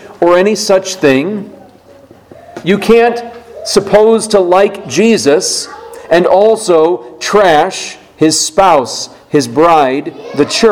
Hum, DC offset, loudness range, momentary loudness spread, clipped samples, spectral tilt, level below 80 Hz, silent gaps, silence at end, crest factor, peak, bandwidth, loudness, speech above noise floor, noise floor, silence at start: none; under 0.1%; 3 LU; 13 LU; 0.9%; -4 dB/octave; -44 dBFS; none; 0 s; 10 dB; 0 dBFS; 16.5 kHz; -10 LUFS; 30 dB; -39 dBFS; 0 s